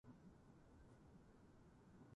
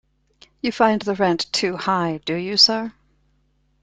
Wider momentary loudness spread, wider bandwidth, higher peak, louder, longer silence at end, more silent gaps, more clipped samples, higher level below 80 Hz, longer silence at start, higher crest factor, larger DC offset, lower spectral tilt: second, 3 LU vs 13 LU; second, 9.4 kHz vs 11.5 kHz; second, -52 dBFS vs -2 dBFS; second, -68 LUFS vs -19 LUFS; second, 0 s vs 0.95 s; neither; neither; second, -74 dBFS vs -60 dBFS; second, 0.05 s vs 0.65 s; second, 14 dB vs 20 dB; neither; first, -7 dB/octave vs -3.5 dB/octave